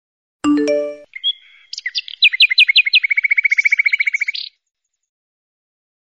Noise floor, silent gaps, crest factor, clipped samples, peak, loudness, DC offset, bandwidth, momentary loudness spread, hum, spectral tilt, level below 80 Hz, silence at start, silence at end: -35 dBFS; none; 16 dB; under 0.1%; -2 dBFS; -13 LUFS; under 0.1%; 11 kHz; 18 LU; none; -1 dB/octave; -66 dBFS; 0.45 s; 1.6 s